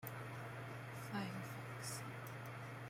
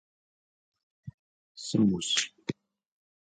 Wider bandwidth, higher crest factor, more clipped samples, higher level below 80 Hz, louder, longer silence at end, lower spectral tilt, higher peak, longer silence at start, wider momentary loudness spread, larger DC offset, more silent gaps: first, 16.5 kHz vs 9.6 kHz; second, 16 dB vs 24 dB; neither; second, -76 dBFS vs -64 dBFS; second, -48 LUFS vs -29 LUFS; second, 0 s vs 0.75 s; about the same, -5 dB/octave vs -4 dB/octave; second, -32 dBFS vs -10 dBFS; second, 0 s vs 1.05 s; second, 5 LU vs 24 LU; neither; second, none vs 1.14-1.55 s